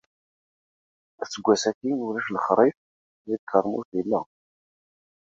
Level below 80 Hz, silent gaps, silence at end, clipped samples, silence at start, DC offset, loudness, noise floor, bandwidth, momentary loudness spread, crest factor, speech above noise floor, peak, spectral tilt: -70 dBFS; 1.75-1.81 s, 2.77-3.25 s, 3.39-3.47 s, 3.85-3.92 s; 1.1 s; under 0.1%; 1.2 s; under 0.1%; -25 LUFS; under -90 dBFS; 7.8 kHz; 12 LU; 24 dB; over 66 dB; -4 dBFS; -4.5 dB/octave